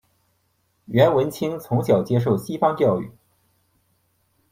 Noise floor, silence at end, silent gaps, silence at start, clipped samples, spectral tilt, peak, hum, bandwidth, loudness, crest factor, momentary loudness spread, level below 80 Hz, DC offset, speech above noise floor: -68 dBFS; 1.4 s; none; 0.9 s; under 0.1%; -7.5 dB/octave; -4 dBFS; none; 16 kHz; -21 LUFS; 20 dB; 9 LU; -58 dBFS; under 0.1%; 48 dB